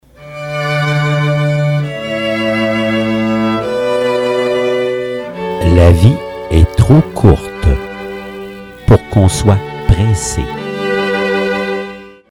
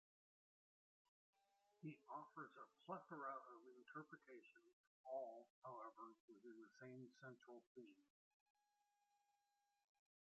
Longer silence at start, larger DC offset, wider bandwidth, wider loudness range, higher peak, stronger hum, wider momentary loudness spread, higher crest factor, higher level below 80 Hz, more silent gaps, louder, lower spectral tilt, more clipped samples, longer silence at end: second, 0.2 s vs 1.8 s; neither; first, 13.5 kHz vs 7.4 kHz; second, 3 LU vs 8 LU; first, 0 dBFS vs -40 dBFS; neither; about the same, 13 LU vs 12 LU; second, 12 dB vs 22 dB; first, -24 dBFS vs under -90 dBFS; second, none vs 4.73-5.04 s, 5.50-5.62 s, 6.20-6.28 s, 7.67-7.75 s; first, -13 LUFS vs -59 LUFS; about the same, -6.5 dB/octave vs -5.5 dB/octave; first, 0.3% vs under 0.1%; second, 0.2 s vs 2.25 s